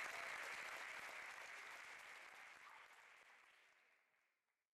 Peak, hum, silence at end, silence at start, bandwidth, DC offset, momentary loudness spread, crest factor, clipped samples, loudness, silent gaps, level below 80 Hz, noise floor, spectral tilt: -36 dBFS; none; 0.8 s; 0 s; 15 kHz; under 0.1%; 17 LU; 20 dB; under 0.1%; -53 LUFS; none; under -90 dBFS; -90 dBFS; 0.5 dB/octave